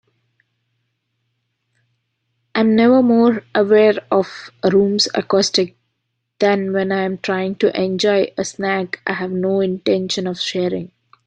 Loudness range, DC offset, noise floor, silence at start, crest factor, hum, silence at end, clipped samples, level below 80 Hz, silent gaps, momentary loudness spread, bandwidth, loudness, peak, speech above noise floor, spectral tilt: 4 LU; under 0.1%; -73 dBFS; 2.55 s; 16 dB; none; 0.4 s; under 0.1%; -60 dBFS; none; 10 LU; 9.6 kHz; -17 LUFS; -2 dBFS; 57 dB; -5 dB/octave